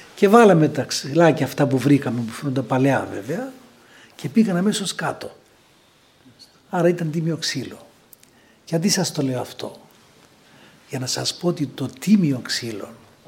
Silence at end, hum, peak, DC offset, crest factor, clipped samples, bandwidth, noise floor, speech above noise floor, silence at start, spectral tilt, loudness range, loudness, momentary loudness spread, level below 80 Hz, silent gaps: 0.35 s; none; 0 dBFS; under 0.1%; 20 dB; under 0.1%; 17 kHz; -55 dBFS; 36 dB; 0 s; -5.5 dB/octave; 7 LU; -20 LUFS; 16 LU; -66 dBFS; none